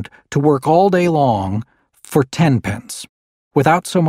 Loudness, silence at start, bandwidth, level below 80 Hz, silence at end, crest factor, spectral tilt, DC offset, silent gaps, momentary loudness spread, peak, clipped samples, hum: -16 LUFS; 0 s; 16 kHz; -50 dBFS; 0 s; 16 dB; -6.5 dB/octave; under 0.1%; 3.09-3.51 s; 13 LU; 0 dBFS; under 0.1%; none